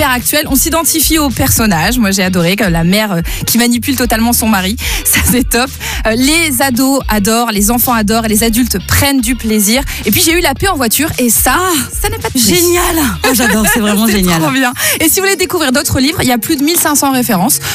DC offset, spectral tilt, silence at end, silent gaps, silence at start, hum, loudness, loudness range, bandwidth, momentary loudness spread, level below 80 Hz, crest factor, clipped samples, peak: under 0.1%; -3 dB/octave; 0 s; none; 0 s; none; -10 LUFS; 1 LU; 16 kHz; 4 LU; -26 dBFS; 10 dB; under 0.1%; -2 dBFS